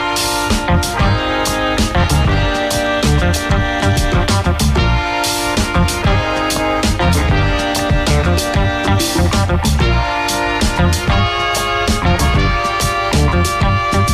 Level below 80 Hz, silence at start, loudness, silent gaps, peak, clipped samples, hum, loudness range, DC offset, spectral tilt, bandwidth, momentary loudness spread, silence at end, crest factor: -22 dBFS; 0 s; -15 LUFS; none; -4 dBFS; under 0.1%; none; 0 LU; under 0.1%; -4.5 dB/octave; 15 kHz; 2 LU; 0 s; 10 dB